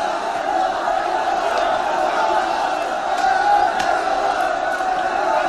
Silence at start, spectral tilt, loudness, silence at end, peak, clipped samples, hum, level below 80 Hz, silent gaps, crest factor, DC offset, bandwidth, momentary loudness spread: 0 s; -2.5 dB/octave; -19 LUFS; 0 s; -6 dBFS; under 0.1%; none; -50 dBFS; none; 14 dB; 0.1%; 13 kHz; 5 LU